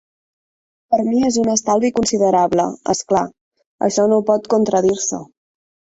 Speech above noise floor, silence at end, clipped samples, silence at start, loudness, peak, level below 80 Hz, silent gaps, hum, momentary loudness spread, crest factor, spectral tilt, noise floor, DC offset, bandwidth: over 74 dB; 0.7 s; under 0.1%; 0.9 s; -17 LUFS; -2 dBFS; -54 dBFS; 3.41-3.51 s, 3.66-3.79 s; none; 7 LU; 16 dB; -4.5 dB/octave; under -90 dBFS; under 0.1%; 8.2 kHz